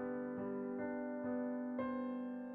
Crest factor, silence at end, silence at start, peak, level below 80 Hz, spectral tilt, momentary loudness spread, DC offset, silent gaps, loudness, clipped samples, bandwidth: 12 dB; 0 s; 0 s; -30 dBFS; -76 dBFS; -7 dB/octave; 2 LU; under 0.1%; none; -42 LUFS; under 0.1%; 3.4 kHz